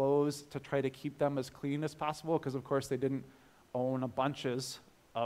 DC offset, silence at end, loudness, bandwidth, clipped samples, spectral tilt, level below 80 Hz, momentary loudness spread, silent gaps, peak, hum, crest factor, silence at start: under 0.1%; 0 s; -36 LUFS; 16 kHz; under 0.1%; -6 dB/octave; -70 dBFS; 8 LU; none; -18 dBFS; none; 16 dB; 0 s